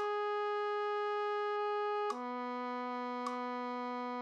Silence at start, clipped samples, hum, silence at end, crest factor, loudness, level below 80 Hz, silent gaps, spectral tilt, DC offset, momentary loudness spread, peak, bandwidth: 0 s; under 0.1%; none; 0 s; 14 dB; -37 LUFS; under -90 dBFS; none; -3 dB/octave; under 0.1%; 4 LU; -24 dBFS; 9 kHz